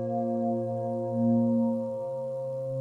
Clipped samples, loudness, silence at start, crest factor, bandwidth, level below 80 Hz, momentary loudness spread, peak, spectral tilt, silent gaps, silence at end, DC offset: under 0.1%; -29 LUFS; 0 s; 12 dB; 1.7 kHz; -78 dBFS; 9 LU; -16 dBFS; -11.5 dB/octave; none; 0 s; under 0.1%